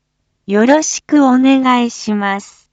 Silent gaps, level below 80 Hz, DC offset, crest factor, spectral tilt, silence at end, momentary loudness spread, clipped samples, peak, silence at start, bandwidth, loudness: none; -60 dBFS; under 0.1%; 12 dB; -4 dB/octave; 0.3 s; 8 LU; under 0.1%; 0 dBFS; 0.5 s; 8 kHz; -13 LUFS